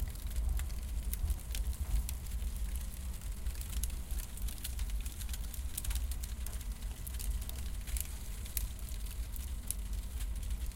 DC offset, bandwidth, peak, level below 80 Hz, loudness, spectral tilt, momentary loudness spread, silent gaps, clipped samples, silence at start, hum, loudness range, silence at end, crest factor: under 0.1%; 17 kHz; -14 dBFS; -38 dBFS; -41 LUFS; -3.5 dB/octave; 5 LU; none; under 0.1%; 0 s; none; 2 LU; 0 s; 24 dB